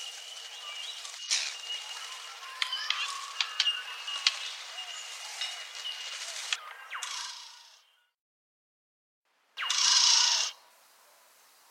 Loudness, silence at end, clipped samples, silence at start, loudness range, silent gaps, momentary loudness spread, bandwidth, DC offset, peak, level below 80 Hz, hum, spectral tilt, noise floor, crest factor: -29 LUFS; 1.1 s; under 0.1%; 0 s; 11 LU; 8.14-9.23 s; 18 LU; 16.5 kHz; under 0.1%; -6 dBFS; under -90 dBFS; none; 8.5 dB/octave; -64 dBFS; 28 dB